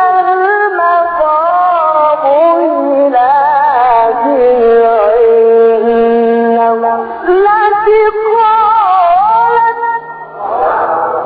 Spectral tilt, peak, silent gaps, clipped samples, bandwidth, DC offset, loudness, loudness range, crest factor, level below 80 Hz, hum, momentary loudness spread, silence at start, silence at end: -2.5 dB/octave; 0 dBFS; none; under 0.1%; 4.9 kHz; under 0.1%; -9 LUFS; 1 LU; 8 dB; -46 dBFS; none; 5 LU; 0 s; 0 s